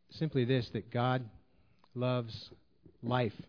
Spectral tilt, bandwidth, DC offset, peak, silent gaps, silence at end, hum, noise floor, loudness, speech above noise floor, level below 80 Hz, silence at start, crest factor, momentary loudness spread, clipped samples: -8.5 dB/octave; 5.4 kHz; under 0.1%; -16 dBFS; none; 0.05 s; none; -69 dBFS; -35 LUFS; 35 dB; -66 dBFS; 0.1 s; 20 dB; 16 LU; under 0.1%